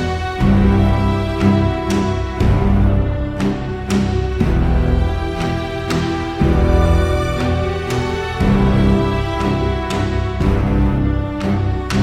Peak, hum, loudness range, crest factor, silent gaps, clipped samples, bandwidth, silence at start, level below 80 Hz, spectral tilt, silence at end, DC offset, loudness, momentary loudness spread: -2 dBFS; none; 2 LU; 14 dB; none; under 0.1%; 12.5 kHz; 0 s; -22 dBFS; -7.5 dB/octave; 0 s; under 0.1%; -17 LUFS; 6 LU